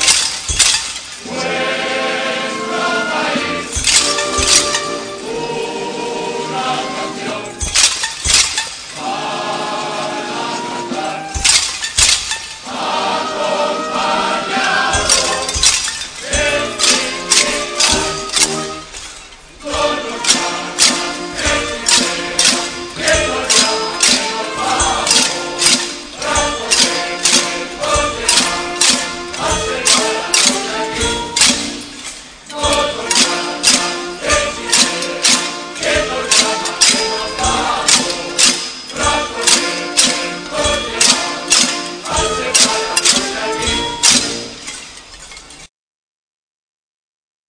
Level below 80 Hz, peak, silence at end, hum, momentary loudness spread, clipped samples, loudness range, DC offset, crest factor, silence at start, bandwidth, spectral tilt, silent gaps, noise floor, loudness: -36 dBFS; 0 dBFS; 1.85 s; none; 11 LU; under 0.1%; 3 LU; under 0.1%; 16 dB; 0 s; 11 kHz; -0.5 dB/octave; none; -36 dBFS; -14 LUFS